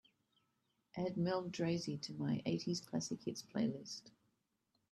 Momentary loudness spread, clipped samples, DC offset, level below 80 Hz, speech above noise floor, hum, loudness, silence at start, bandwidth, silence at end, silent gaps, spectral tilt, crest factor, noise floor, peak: 8 LU; under 0.1%; under 0.1%; -78 dBFS; 43 dB; none; -41 LUFS; 0.95 s; 13 kHz; 0.8 s; none; -5.5 dB/octave; 16 dB; -84 dBFS; -26 dBFS